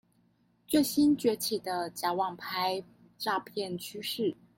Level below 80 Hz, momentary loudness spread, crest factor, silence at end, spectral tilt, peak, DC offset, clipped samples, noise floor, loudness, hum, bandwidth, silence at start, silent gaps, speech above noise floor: -70 dBFS; 11 LU; 16 dB; 0.25 s; -4 dB/octave; -14 dBFS; under 0.1%; under 0.1%; -69 dBFS; -31 LUFS; none; 17 kHz; 0.7 s; none; 38 dB